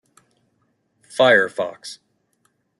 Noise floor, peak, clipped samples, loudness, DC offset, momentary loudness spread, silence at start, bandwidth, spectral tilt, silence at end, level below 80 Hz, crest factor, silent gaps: -68 dBFS; -2 dBFS; under 0.1%; -18 LUFS; under 0.1%; 22 LU; 1.15 s; 12 kHz; -3.5 dB/octave; 0.85 s; -70 dBFS; 20 dB; none